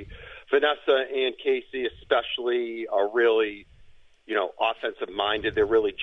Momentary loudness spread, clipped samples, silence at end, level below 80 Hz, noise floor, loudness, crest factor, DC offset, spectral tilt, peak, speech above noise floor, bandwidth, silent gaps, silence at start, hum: 9 LU; under 0.1%; 0 s; -54 dBFS; -51 dBFS; -25 LUFS; 18 dB; under 0.1%; -6 dB/octave; -6 dBFS; 26 dB; 6 kHz; none; 0 s; none